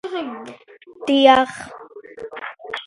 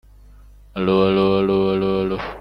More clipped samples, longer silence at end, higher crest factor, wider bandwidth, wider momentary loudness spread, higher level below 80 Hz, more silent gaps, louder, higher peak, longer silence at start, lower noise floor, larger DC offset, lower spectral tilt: neither; about the same, 0.05 s vs 0 s; about the same, 20 dB vs 16 dB; first, 11.5 kHz vs 5.6 kHz; first, 26 LU vs 8 LU; second, -60 dBFS vs -44 dBFS; neither; about the same, -17 LUFS vs -19 LUFS; first, 0 dBFS vs -4 dBFS; second, 0.05 s vs 0.75 s; second, -39 dBFS vs -45 dBFS; neither; second, -3.5 dB/octave vs -8.5 dB/octave